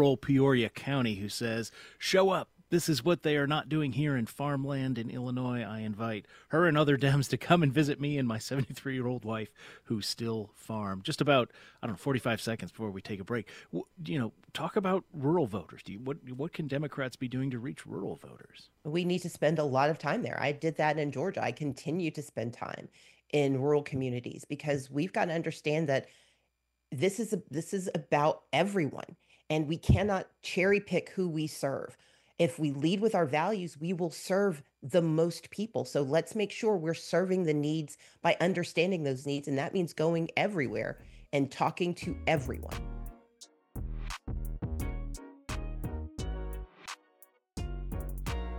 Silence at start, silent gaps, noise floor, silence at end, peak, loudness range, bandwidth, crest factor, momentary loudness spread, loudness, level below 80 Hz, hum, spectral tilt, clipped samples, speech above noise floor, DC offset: 0 s; none; -79 dBFS; 0 s; -8 dBFS; 7 LU; 16 kHz; 24 dB; 14 LU; -32 LUFS; -48 dBFS; none; -6 dB/octave; under 0.1%; 48 dB; under 0.1%